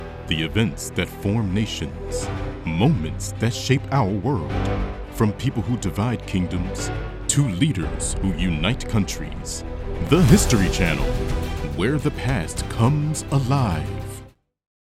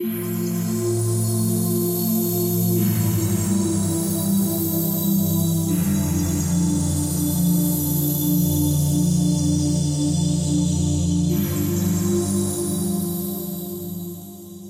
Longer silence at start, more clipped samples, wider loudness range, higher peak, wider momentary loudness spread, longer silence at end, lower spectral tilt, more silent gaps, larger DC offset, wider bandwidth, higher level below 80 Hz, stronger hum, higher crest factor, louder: about the same, 0 s vs 0 s; neither; about the same, 3 LU vs 2 LU; first, 0 dBFS vs -10 dBFS; first, 9 LU vs 5 LU; first, 0.55 s vs 0 s; about the same, -5.5 dB/octave vs -6 dB/octave; neither; neither; about the same, 16 kHz vs 16 kHz; first, -32 dBFS vs -42 dBFS; neither; first, 22 dB vs 12 dB; about the same, -23 LUFS vs -21 LUFS